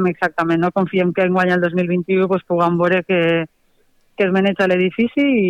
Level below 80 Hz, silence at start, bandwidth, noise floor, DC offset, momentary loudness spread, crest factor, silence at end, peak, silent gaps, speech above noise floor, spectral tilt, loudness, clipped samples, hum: -58 dBFS; 0 s; 7.6 kHz; -58 dBFS; under 0.1%; 3 LU; 12 dB; 0 s; -6 dBFS; none; 41 dB; -8 dB/octave; -17 LUFS; under 0.1%; none